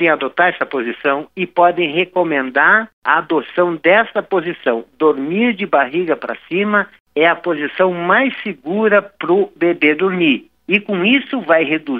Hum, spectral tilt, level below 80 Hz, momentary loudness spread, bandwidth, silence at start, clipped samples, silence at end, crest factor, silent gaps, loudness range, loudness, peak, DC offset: none; -8 dB/octave; -66 dBFS; 7 LU; 4.8 kHz; 0 s; under 0.1%; 0 s; 16 dB; 2.93-3.02 s, 7.00-7.05 s; 2 LU; -15 LUFS; 0 dBFS; under 0.1%